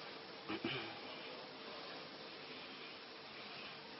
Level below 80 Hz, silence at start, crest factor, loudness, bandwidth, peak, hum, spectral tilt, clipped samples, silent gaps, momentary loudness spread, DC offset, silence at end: -84 dBFS; 0 s; 22 dB; -48 LUFS; 5.8 kHz; -28 dBFS; none; -1.5 dB/octave; under 0.1%; none; 8 LU; under 0.1%; 0 s